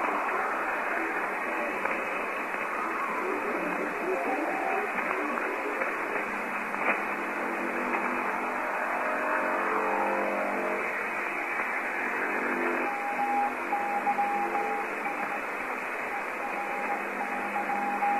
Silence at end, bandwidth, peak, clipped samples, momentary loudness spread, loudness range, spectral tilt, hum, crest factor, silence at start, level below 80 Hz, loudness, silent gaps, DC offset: 0 s; 14.5 kHz; -12 dBFS; under 0.1%; 4 LU; 2 LU; -4.5 dB/octave; none; 18 dB; 0 s; -68 dBFS; -29 LUFS; none; under 0.1%